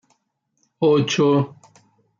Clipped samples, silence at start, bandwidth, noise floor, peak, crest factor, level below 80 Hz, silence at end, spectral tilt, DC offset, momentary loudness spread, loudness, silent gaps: under 0.1%; 0.8 s; 7.4 kHz; -72 dBFS; -6 dBFS; 14 dB; -66 dBFS; 0.7 s; -6 dB/octave; under 0.1%; 5 LU; -19 LUFS; none